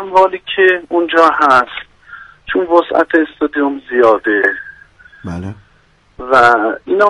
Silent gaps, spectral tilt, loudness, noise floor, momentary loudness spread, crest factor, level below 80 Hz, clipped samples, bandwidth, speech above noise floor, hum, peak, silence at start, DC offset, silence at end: none; -5.5 dB/octave; -12 LUFS; -51 dBFS; 18 LU; 14 dB; -48 dBFS; under 0.1%; 11 kHz; 39 dB; none; 0 dBFS; 0 s; under 0.1%; 0 s